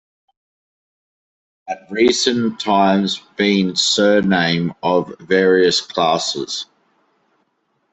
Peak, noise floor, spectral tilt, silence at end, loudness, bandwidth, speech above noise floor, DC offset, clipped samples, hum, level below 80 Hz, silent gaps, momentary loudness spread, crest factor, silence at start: -2 dBFS; -67 dBFS; -4 dB/octave; 1.3 s; -16 LUFS; 8.4 kHz; 50 dB; under 0.1%; under 0.1%; none; -58 dBFS; none; 11 LU; 16 dB; 1.65 s